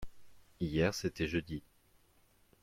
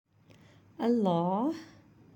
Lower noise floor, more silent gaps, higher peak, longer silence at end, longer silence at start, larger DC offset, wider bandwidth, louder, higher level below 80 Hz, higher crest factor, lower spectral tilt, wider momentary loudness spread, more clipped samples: first, -68 dBFS vs -59 dBFS; neither; second, -18 dBFS vs -14 dBFS; first, 1 s vs 0.5 s; second, 0 s vs 0.8 s; neither; about the same, 16.5 kHz vs 17 kHz; second, -36 LUFS vs -30 LUFS; first, -56 dBFS vs -76 dBFS; about the same, 20 dB vs 18 dB; second, -5.5 dB/octave vs -8.5 dB/octave; first, 14 LU vs 7 LU; neither